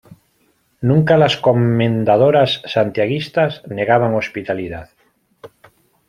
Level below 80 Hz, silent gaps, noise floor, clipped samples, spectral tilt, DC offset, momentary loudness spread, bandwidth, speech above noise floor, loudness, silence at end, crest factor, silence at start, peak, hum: -52 dBFS; none; -61 dBFS; under 0.1%; -7.5 dB/octave; under 0.1%; 11 LU; 11 kHz; 45 dB; -16 LUFS; 0.6 s; 16 dB; 0.8 s; -2 dBFS; none